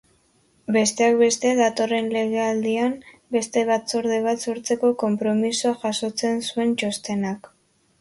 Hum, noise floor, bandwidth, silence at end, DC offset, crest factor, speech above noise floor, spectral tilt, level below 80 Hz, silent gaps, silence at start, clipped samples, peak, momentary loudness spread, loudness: none; -62 dBFS; 11.5 kHz; 0.6 s; under 0.1%; 16 dB; 40 dB; -4 dB/octave; -66 dBFS; none; 0.7 s; under 0.1%; -6 dBFS; 8 LU; -22 LUFS